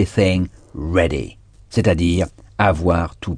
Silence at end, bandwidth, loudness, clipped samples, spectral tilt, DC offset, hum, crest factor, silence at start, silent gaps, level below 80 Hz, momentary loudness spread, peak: 0 s; 10 kHz; -19 LUFS; under 0.1%; -6.5 dB/octave; under 0.1%; none; 18 dB; 0 s; none; -32 dBFS; 10 LU; 0 dBFS